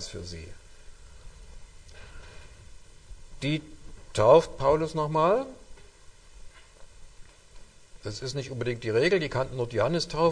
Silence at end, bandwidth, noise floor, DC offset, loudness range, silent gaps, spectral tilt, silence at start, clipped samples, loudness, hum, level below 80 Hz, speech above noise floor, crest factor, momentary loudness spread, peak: 0 s; 10 kHz; -51 dBFS; under 0.1%; 15 LU; none; -5.5 dB/octave; 0 s; under 0.1%; -26 LUFS; none; -48 dBFS; 25 dB; 22 dB; 26 LU; -6 dBFS